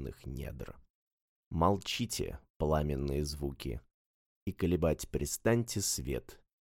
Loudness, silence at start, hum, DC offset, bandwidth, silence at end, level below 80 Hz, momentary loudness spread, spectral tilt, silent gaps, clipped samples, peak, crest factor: -35 LUFS; 0 s; none; under 0.1%; 17 kHz; 0.25 s; -46 dBFS; 13 LU; -5 dB/octave; 0.90-1.51 s, 2.50-2.60 s, 3.94-4.46 s; under 0.1%; -16 dBFS; 20 dB